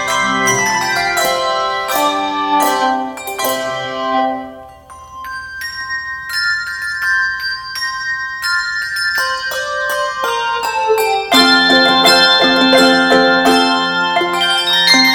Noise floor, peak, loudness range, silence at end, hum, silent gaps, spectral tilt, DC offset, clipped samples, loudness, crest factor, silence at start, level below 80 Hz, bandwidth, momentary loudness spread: -36 dBFS; 0 dBFS; 10 LU; 0 s; none; none; -2 dB/octave; under 0.1%; under 0.1%; -13 LUFS; 14 dB; 0 s; -50 dBFS; 18 kHz; 12 LU